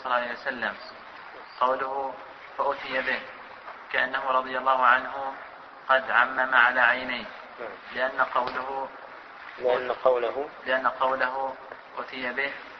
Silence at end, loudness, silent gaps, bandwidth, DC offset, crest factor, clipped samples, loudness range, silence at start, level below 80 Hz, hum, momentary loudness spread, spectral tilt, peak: 0 s; -26 LUFS; none; 6.2 kHz; under 0.1%; 22 dB; under 0.1%; 7 LU; 0 s; -66 dBFS; none; 21 LU; -4.5 dB/octave; -6 dBFS